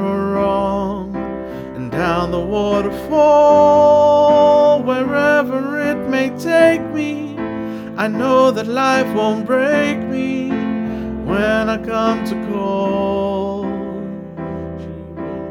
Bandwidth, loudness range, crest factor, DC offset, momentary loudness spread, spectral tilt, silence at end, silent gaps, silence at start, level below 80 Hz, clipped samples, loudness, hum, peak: 15.5 kHz; 7 LU; 16 dB; under 0.1%; 16 LU; -6.5 dB/octave; 0 s; none; 0 s; -42 dBFS; under 0.1%; -16 LUFS; none; 0 dBFS